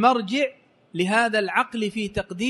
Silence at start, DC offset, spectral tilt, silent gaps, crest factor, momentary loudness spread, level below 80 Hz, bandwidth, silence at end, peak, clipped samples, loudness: 0 s; under 0.1%; -4.5 dB/octave; none; 18 dB; 8 LU; -52 dBFS; 11.5 kHz; 0 s; -6 dBFS; under 0.1%; -23 LUFS